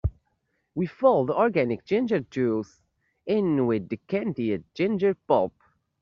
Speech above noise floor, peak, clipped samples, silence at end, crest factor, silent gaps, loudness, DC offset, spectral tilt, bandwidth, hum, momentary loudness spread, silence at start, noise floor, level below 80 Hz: 50 dB; -8 dBFS; under 0.1%; 0.55 s; 18 dB; none; -25 LUFS; under 0.1%; -6.5 dB/octave; 7 kHz; none; 10 LU; 0.05 s; -74 dBFS; -48 dBFS